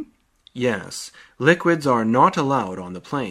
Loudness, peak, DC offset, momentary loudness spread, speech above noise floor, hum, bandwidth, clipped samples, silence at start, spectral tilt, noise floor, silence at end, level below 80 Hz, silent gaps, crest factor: -20 LUFS; 0 dBFS; under 0.1%; 17 LU; 35 dB; none; 15 kHz; under 0.1%; 0 s; -5.5 dB/octave; -55 dBFS; 0 s; -60 dBFS; none; 20 dB